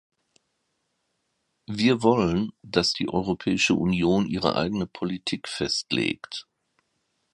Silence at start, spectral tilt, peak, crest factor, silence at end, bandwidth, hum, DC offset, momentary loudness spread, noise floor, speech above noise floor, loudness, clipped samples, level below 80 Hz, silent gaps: 1.7 s; -5 dB/octave; -4 dBFS; 22 dB; 0.9 s; 11.5 kHz; none; under 0.1%; 9 LU; -76 dBFS; 51 dB; -25 LUFS; under 0.1%; -52 dBFS; none